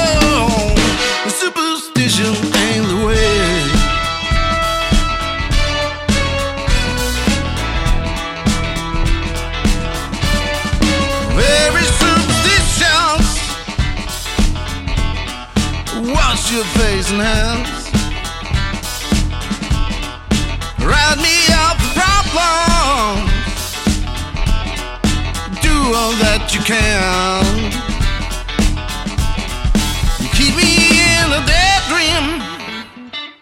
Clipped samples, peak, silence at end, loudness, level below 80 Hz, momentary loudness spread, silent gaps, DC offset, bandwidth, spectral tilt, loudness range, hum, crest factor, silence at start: under 0.1%; 0 dBFS; 0.1 s; -15 LUFS; -20 dBFS; 10 LU; none; under 0.1%; 16.5 kHz; -3.5 dB/octave; 5 LU; none; 14 dB; 0 s